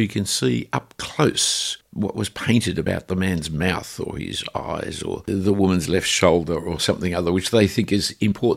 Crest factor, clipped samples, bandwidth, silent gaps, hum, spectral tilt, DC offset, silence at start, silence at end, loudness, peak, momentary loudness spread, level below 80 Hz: 20 dB; under 0.1%; 16 kHz; none; none; -4.5 dB/octave; under 0.1%; 0 s; 0 s; -22 LUFS; 0 dBFS; 9 LU; -46 dBFS